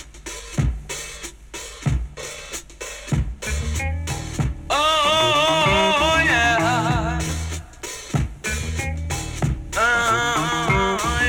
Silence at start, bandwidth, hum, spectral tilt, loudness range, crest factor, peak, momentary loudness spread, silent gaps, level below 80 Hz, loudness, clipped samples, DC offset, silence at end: 0 s; 19 kHz; none; -3.5 dB/octave; 10 LU; 16 dB; -6 dBFS; 16 LU; none; -32 dBFS; -21 LUFS; under 0.1%; under 0.1%; 0 s